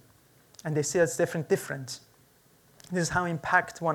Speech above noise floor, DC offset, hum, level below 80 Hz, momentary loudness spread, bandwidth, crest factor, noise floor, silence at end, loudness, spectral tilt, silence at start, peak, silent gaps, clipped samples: 33 dB; under 0.1%; none; -62 dBFS; 13 LU; 19 kHz; 22 dB; -61 dBFS; 0 s; -28 LUFS; -4.5 dB/octave; 0.65 s; -8 dBFS; none; under 0.1%